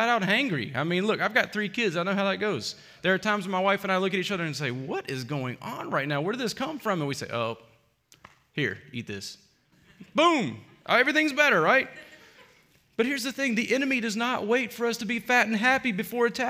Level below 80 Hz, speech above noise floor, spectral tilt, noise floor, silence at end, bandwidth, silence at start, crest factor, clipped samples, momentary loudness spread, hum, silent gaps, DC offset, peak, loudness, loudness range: -70 dBFS; 35 dB; -4.5 dB/octave; -62 dBFS; 0 s; 16 kHz; 0 s; 20 dB; under 0.1%; 13 LU; none; none; under 0.1%; -6 dBFS; -26 LUFS; 7 LU